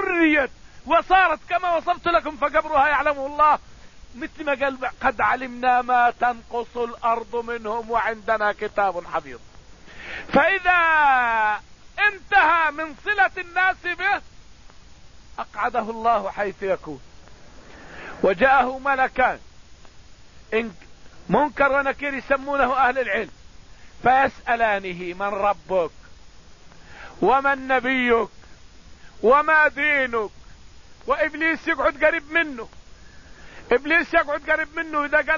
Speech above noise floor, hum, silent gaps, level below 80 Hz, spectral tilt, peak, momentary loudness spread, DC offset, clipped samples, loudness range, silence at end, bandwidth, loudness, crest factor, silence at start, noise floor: 26 dB; none; none; -48 dBFS; -5 dB/octave; -4 dBFS; 13 LU; 0.4%; under 0.1%; 5 LU; 0 s; 7.4 kHz; -21 LUFS; 20 dB; 0 s; -48 dBFS